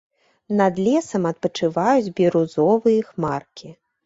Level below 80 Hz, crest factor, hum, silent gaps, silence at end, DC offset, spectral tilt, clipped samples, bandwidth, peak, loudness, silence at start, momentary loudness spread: -62 dBFS; 16 dB; none; none; 0.35 s; under 0.1%; -6.5 dB/octave; under 0.1%; 8 kHz; -4 dBFS; -20 LUFS; 0.5 s; 8 LU